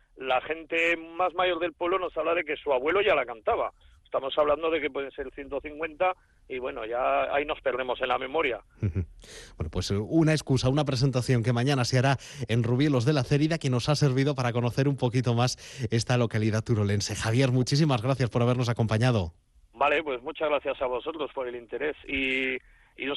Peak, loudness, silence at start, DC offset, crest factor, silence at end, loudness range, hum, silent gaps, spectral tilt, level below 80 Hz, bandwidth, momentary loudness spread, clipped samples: -12 dBFS; -27 LUFS; 0.15 s; under 0.1%; 16 dB; 0 s; 4 LU; none; none; -6 dB/octave; -52 dBFS; 12.5 kHz; 10 LU; under 0.1%